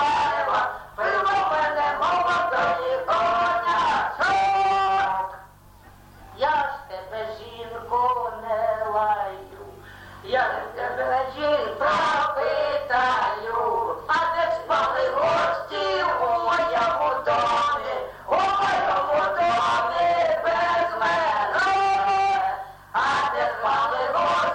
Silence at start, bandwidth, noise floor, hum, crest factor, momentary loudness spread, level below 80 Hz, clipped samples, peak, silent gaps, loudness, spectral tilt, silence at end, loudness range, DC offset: 0 s; 17 kHz; -49 dBFS; none; 12 dB; 8 LU; -54 dBFS; under 0.1%; -10 dBFS; none; -23 LUFS; -3.5 dB/octave; 0 s; 5 LU; under 0.1%